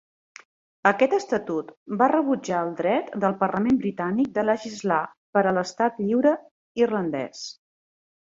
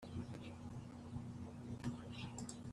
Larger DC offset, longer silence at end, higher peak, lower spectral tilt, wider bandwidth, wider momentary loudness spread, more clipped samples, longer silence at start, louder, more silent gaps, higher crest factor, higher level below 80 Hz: neither; first, 0.75 s vs 0 s; first, -4 dBFS vs -32 dBFS; about the same, -6 dB/octave vs -5.5 dB/octave; second, 7.8 kHz vs 13 kHz; first, 10 LU vs 5 LU; neither; first, 0.85 s vs 0 s; first, -24 LUFS vs -50 LUFS; first, 1.77-1.86 s, 5.17-5.33 s, 6.51-6.75 s vs none; about the same, 20 dB vs 18 dB; about the same, -64 dBFS vs -66 dBFS